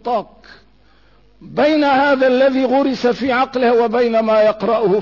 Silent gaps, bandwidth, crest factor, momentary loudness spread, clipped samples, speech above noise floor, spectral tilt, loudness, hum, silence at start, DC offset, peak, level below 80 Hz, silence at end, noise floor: none; 6 kHz; 10 dB; 4 LU; under 0.1%; 37 dB; -6 dB/octave; -15 LUFS; none; 0.05 s; 0.2%; -6 dBFS; -54 dBFS; 0 s; -52 dBFS